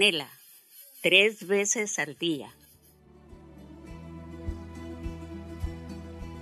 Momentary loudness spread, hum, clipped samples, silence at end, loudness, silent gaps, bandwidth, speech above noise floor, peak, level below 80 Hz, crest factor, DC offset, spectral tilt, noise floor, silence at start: 26 LU; none; under 0.1%; 0 s; -27 LUFS; none; 13.5 kHz; 32 dB; -4 dBFS; -46 dBFS; 26 dB; under 0.1%; -2.5 dB/octave; -58 dBFS; 0 s